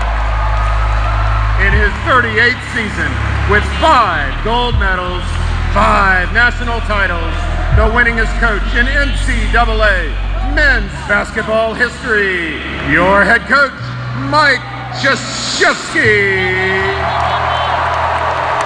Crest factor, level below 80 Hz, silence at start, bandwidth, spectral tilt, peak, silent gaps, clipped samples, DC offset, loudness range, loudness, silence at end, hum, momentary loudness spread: 12 dB; -18 dBFS; 0 s; 9.8 kHz; -5 dB/octave; 0 dBFS; none; under 0.1%; under 0.1%; 1 LU; -13 LUFS; 0 s; none; 7 LU